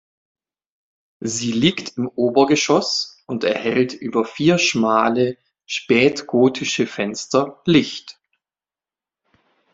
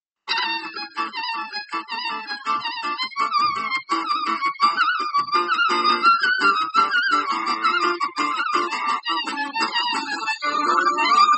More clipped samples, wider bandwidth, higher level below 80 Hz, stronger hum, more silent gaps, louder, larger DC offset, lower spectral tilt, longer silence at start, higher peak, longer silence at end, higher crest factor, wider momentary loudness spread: neither; about the same, 8 kHz vs 8.4 kHz; first, -60 dBFS vs -78 dBFS; neither; neither; about the same, -19 LUFS vs -21 LUFS; neither; first, -4.5 dB/octave vs -1 dB/octave; first, 1.2 s vs 0.25 s; about the same, -2 dBFS vs -4 dBFS; first, 1.6 s vs 0 s; about the same, 20 dB vs 18 dB; about the same, 10 LU vs 10 LU